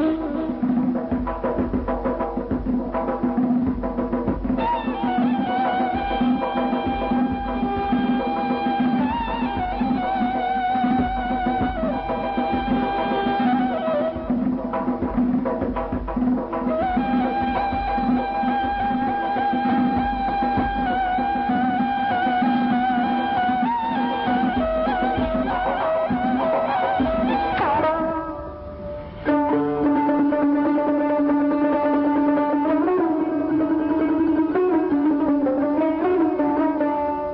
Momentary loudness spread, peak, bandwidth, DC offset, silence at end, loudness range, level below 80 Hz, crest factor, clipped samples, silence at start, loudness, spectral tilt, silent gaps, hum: 5 LU; -10 dBFS; 5.4 kHz; under 0.1%; 0 s; 3 LU; -40 dBFS; 12 dB; under 0.1%; 0 s; -22 LUFS; -5 dB/octave; none; none